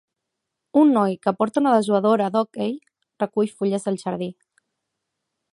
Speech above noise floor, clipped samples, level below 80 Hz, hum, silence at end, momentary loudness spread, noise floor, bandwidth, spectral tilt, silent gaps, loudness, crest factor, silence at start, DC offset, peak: 61 dB; under 0.1%; -72 dBFS; none; 1.2 s; 11 LU; -81 dBFS; 11.5 kHz; -7 dB/octave; none; -21 LUFS; 18 dB; 0.75 s; under 0.1%; -4 dBFS